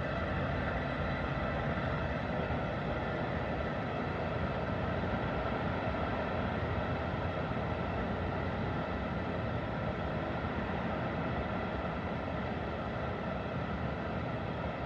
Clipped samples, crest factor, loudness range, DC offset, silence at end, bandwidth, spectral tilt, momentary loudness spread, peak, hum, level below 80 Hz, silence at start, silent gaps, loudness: under 0.1%; 14 dB; 2 LU; under 0.1%; 0 s; 7.6 kHz; -8 dB/octave; 2 LU; -22 dBFS; none; -46 dBFS; 0 s; none; -35 LUFS